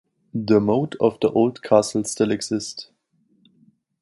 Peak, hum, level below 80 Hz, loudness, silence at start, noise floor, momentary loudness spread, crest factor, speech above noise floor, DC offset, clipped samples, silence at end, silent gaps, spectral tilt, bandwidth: -2 dBFS; none; -58 dBFS; -21 LUFS; 0.35 s; -65 dBFS; 12 LU; 20 dB; 44 dB; under 0.1%; under 0.1%; 1.2 s; none; -5.5 dB/octave; 11.5 kHz